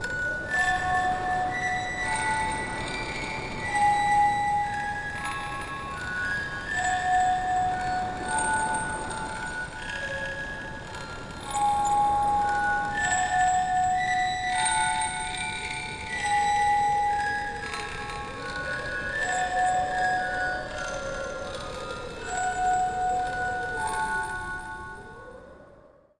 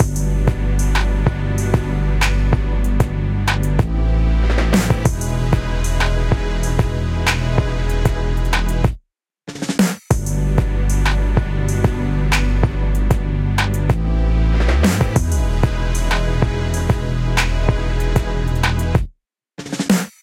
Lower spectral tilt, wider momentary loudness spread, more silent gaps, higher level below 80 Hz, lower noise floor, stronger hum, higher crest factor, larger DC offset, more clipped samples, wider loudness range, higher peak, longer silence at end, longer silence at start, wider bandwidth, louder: second, -2.5 dB/octave vs -5.5 dB/octave; first, 11 LU vs 4 LU; neither; second, -46 dBFS vs -20 dBFS; about the same, -54 dBFS vs -54 dBFS; neither; about the same, 14 dB vs 16 dB; neither; neither; first, 5 LU vs 2 LU; second, -14 dBFS vs -2 dBFS; first, 0.3 s vs 0.15 s; about the same, 0 s vs 0 s; second, 11.5 kHz vs 15.5 kHz; second, -27 LUFS vs -19 LUFS